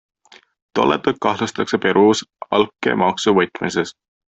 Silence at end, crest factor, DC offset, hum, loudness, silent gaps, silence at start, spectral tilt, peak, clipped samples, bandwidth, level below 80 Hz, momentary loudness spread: 0.45 s; 16 dB; under 0.1%; none; -18 LUFS; none; 0.75 s; -4.5 dB/octave; -2 dBFS; under 0.1%; 8.2 kHz; -58 dBFS; 8 LU